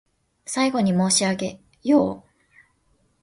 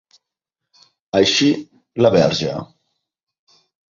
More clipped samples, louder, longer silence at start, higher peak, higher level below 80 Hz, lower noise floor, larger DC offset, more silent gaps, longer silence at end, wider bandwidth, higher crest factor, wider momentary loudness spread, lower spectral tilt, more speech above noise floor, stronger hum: neither; second, -22 LUFS vs -17 LUFS; second, 0.5 s vs 1.15 s; second, -6 dBFS vs 0 dBFS; second, -60 dBFS vs -54 dBFS; second, -65 dBFS vs -83 dBFS; neither; neither; second, 1.05 s vs 1.3 s; first, 11.5 kHz vs 7.6 kHz; about the same, 18 dB vs 20 dB; about the same, 13 LU vs 13 LU; about the same, -4 dB/octave vs -4.5 dB/octave; second, 44 dB vs 67 dB; neither